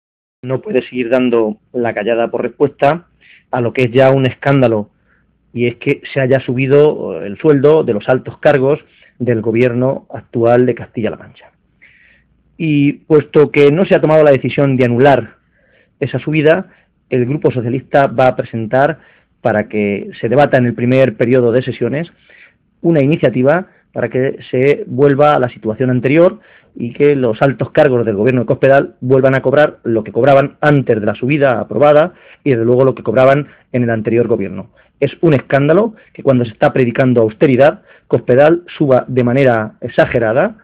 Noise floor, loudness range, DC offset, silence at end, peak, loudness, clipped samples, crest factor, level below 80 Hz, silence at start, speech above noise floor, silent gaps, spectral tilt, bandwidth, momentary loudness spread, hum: -56 dBFS; 4 LU; under 0.1%; 0.1 s; 0 dBFS; -13 LUFS; under 0.1%; 12 dB; -50 dBFS; 0.45 s; 43 dB; none; -9 dB/octave; 6.2 kHz; 10 LU; none